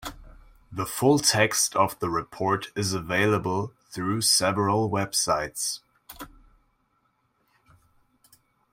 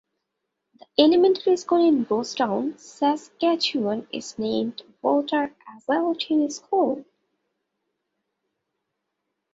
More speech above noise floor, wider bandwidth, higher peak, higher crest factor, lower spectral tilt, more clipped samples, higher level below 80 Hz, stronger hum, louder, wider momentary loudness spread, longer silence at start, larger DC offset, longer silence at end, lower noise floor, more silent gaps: second, 46 dB vs 58 dB; first, 16.5 kHz vs 7.8 kHz; about the same, -6 dBFS vs -4 dBFS; about the same, 22 dB vs 20 dB; about the same, -3.5 dB/octave vs -4.5 dB/octave; neither; first, -56 dBFS vs -70 dBFS; neither; about the same, -24 LUFS vs -23 LUFS; first, 18 LU vs 11 LU; second, 0 s vs 1 s; neither; about the same, 2.45 s vs 2.5 s; second, -70 dBFS vs -80 dBFS; neither